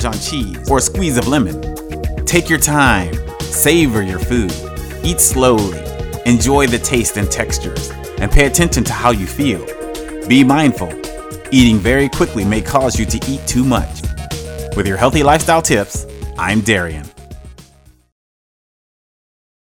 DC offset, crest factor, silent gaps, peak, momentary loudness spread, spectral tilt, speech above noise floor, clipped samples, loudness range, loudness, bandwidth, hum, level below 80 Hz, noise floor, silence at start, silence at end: under 0.1%; 16 dB; none; 0 dBFS; 14 LU; -4.5 dB/octave; 33 dB; under 0.1%; 3 LU; -14 LUFS; 20 kHz; none; -26 dBFS; -47 dBFS; 0 s; 2 s